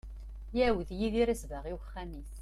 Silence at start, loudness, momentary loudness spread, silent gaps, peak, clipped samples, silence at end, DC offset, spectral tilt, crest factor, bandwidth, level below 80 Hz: 0.05 s; -33 LUFS; 15 LU; none; -18 dBFS; under 0.1%; 0 s; under 0.1%; -6 dB/octave; 16 dB; 14.5 kHz; -42 dBFS